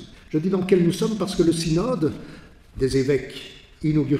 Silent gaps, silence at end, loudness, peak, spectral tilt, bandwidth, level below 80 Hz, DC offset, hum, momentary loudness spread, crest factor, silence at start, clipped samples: none; 0 s; -22 LUFS; -6 dBFS; -6.5 dB/octave; 14.5 kHz; -44 dBFS; under 0.1%; none; 17 LU; 18 dB; 0 s; under 0.1%